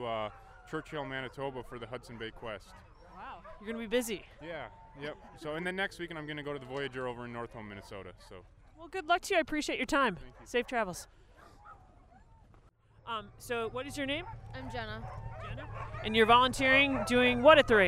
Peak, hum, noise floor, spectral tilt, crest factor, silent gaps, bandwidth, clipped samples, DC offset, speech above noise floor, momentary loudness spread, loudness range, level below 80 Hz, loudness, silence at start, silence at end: -8 dBFS; none; -62 dBFS; -4 dB/octave; 24 dB; none; 16 kHz; under 0.1%; under 0.1%; 29 dB; 21 LU; 12 LU; -54 dBFS; -31 LUFS; 0 s; 0 s